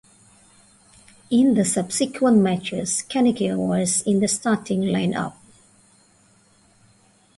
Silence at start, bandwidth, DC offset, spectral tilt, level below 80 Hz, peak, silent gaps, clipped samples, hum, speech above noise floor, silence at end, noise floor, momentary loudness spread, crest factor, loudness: 1.3 s; 11.5 kHz; under 0.1%; -5 dB/octave; -60 dBFS; -6 dBFS; none; under 0.1%; none; 37 dB; 2.05 s; -57 dBFS; 7 LU; 16 dB; -21 LUFS